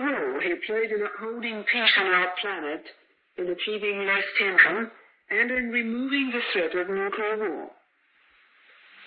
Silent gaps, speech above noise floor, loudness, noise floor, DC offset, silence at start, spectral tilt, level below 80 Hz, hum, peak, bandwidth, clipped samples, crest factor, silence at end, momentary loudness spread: none; 38 dB; -24 LUFS; -64 dBFS; under 0.1%; 0 s; -7.5 dB/octave; -68 dBFS; none; -4 dBFS; 5.2 kHz; under 0.1%; 22 dB; 0 s; 13 LU